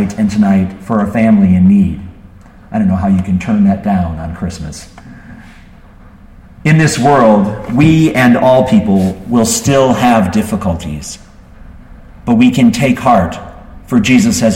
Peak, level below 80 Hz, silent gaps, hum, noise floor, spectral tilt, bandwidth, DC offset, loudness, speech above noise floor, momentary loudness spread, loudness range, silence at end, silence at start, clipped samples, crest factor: 0 dBFS; -34 dBFS; none; none; -37 dBFS; -6 dB/octave; 16.5 kHz; under 0.1%; -11 LUFS; 27 dB; 13 LU; 7 LU; 0 s; 0 s; under 0.1%; 12 dB